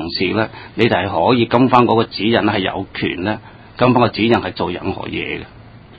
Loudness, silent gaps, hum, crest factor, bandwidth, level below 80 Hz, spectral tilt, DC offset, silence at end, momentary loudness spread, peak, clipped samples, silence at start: -16 LUFS; none; none; 16 dB; 8 kHz; -42 dBFS; -8 dB/octave; under 0.1%; 0.05 s; 11 LU; 0 dBFS; under 0.1%; 0 s